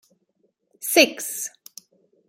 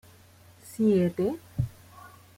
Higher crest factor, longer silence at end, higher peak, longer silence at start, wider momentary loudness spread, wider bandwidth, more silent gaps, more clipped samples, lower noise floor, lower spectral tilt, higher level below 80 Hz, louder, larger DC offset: first, 24 dB vs 16 dB; first, 0.8 s vs 0.3 s; first, -2 dBFS vs -14 dBFS; first, 0.8 s vs 0.65 s; first, 16 LU vs 11 LU; about the same, 16.5 kHz vs 16.5 kHz; neither; neither; first, -69 dBFS vs -55 dBFS; second, -0.5 dB/octave vs -8 dB/octave; second, -72 dBFS vs -54 dBFS; first, -21 LUFS vs -27 LUFS; neither